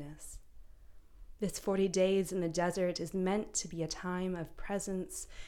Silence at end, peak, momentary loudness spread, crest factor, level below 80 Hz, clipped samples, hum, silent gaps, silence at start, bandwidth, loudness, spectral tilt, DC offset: 0 s; -18 dBFS; 12 LU; 18 dB; -54 dBFS; under 0.1%; none; none; 0 s; 17.5 kHz; -35 LUFS; -5 dB/octave; under 0.1%